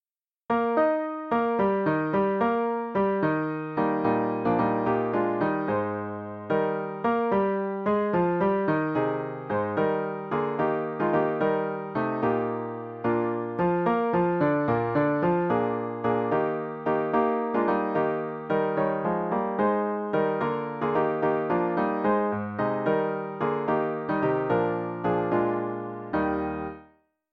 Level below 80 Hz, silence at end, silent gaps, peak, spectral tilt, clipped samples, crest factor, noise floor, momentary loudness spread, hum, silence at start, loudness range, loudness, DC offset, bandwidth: -60 dBFS; 0.5 s; none; -12 dBFS; -10 dB/octave; under 0.1%; 14 dB; -60 dBFS; 5 LU; none; 0.5 s; 2 LU; -26 LUFS; under 0.1%; 5.4 kHz